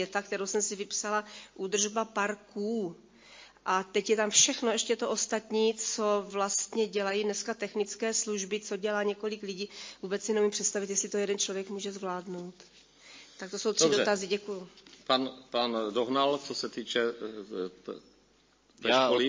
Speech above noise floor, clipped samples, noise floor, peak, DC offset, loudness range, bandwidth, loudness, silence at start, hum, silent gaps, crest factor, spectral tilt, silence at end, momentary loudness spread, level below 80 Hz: 35 dB; under 0.1%; -66 dBFS; -8 dBFS; under 0.1%; 5 LU; 7.8 kHz; -30 LUFS; 0 s; none; none; 22 dB; -2 dB/octave; 0 s; 14 LU; -74 dBFS